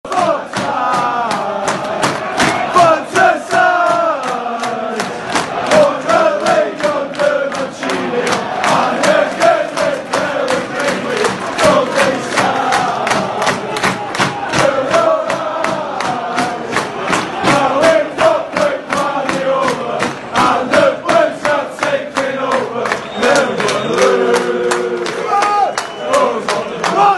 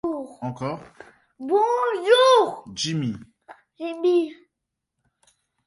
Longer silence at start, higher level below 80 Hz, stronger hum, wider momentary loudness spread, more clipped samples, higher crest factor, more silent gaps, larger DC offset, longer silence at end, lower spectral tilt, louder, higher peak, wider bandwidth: about the same, 0.05 s vs 0.05 s; first, -50 dBFS vs -66 dBFS; neither; second, 7 LU vs 17 LU; neither; second, 14 dB vs 20 dB; neither; neither; second, 0 s vs 1.35 s; about the same, -3.5 dB/octave vs -4.5 dB/octave; first, -14 LUFS vs -22 LUFS; first, 0 dBFS vs -4 dBFS; about the same, 12.5 kHz vs 11.5 kHz